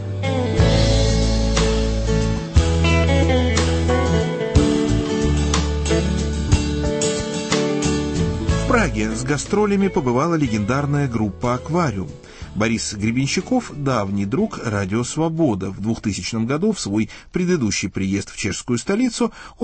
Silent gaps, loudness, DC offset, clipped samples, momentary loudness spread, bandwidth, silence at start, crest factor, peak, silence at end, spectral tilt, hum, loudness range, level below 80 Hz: none; -20 LUFS; under 0.1%; under 0.1%; 6 LU; 8.8 kHz; 0 s; 16 dB; -2 dBFS; 0 s; -5.5 dB/octave; none; 4 LU; -26 dBFS